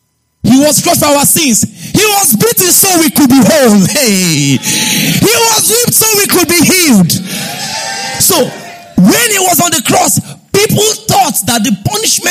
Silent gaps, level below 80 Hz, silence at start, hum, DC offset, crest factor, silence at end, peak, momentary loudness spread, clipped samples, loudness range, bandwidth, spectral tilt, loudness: none; -44 dBFS; 0.45 s; none; under 0.1%; 8 dB; 0 s; 0 dBFS; 8 LU; 0.2%; 3 LU; over 20 kHz; -3 dB/octave; -7 LUFS